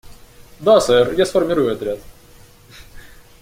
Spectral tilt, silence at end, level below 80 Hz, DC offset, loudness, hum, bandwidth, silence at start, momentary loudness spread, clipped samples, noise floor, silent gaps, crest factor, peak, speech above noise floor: -4.5 dB/octave; 0.4 s; -46 dBFS; under 0.1%; -16 LUFS; none; 16.5 kHz; 0.05 s; 13 LU; under 0.1%; -45 dBFS; none; 18 dB; -2 dBFS; 30 dB